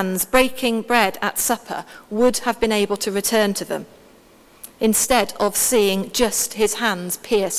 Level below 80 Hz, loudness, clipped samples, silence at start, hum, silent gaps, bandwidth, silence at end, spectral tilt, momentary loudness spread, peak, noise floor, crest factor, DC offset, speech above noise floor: -48 dBFS; -19 LUFS; under 0.1%; 0 s; none; none; 16 kHz; 0 s; -2.5 dB/octave; 9 LU; 0 dBFS; -50 dBFS; 20 dB; under 0.1%; 30 dB